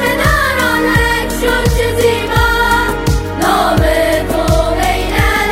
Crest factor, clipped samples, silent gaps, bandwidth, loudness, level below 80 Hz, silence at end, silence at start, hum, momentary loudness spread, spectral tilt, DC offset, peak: 12 dB; under 0.1%; none; 16 kHz; -12 LUFS; -20 dBFS; 0 s; 0 s; none; 3 LU; -4.5 dB/octave; under 0.1%; 0 dBFS